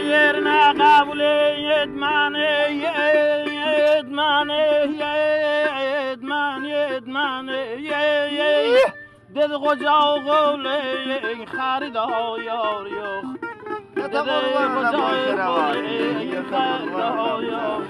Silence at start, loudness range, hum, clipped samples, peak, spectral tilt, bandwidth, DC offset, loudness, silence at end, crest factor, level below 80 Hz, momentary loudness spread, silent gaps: 0 s; 5 LU; none; under 0.1%; -4 dBFS; -4.5 dB/octave; 11.5 kHz; under 0.1%; -20 LUFS; 0 s; 16 dB; -64 dBFS; 10 LU; none